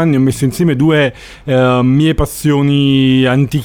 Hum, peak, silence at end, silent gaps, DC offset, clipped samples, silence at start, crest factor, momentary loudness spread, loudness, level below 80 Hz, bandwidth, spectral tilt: none; -2 dBFS; 0 s; none; under 0.1%; under 0.1%; 0 s; 8 dB; 5 LU; -12 LUFS; -32 dBFS; 17.5 kHz; -6.5 dB/octave